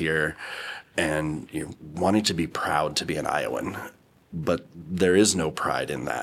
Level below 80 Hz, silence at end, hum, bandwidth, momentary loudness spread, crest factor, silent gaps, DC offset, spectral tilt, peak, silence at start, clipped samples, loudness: -52 dBFS; 0 s; none; 16 kHz; 13 LU; 20 dB; none; under 0.1%; -4 dB/octave; -6 dBFS; 0 s; under 0.1%; -26 LUFS